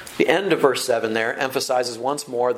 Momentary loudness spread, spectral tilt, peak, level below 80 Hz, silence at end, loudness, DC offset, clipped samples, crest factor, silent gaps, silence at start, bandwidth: 6 LU; -3.5 dB/octave; 0 dBFS; -66 dBFS; 0 s; -21 LUFS; under 0.1%; under 0.1%; 20 dB; none; 0 s; 16.5 kHz